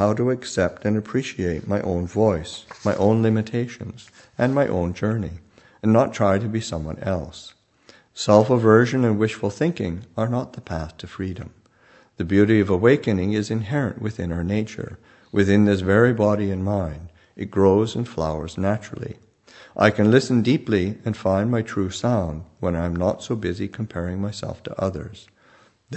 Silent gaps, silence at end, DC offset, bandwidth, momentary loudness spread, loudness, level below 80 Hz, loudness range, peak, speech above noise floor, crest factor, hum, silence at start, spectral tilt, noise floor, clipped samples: none; 0 s; under 0.1%; 8.6 kHz; 15 LU; -22 LUFS; -46 dBFS; 4 LU; 0 dBFS; 34 dB; 22 dB; none; 0 s; -7 dB/octave; -55 dBFS; under 0.1%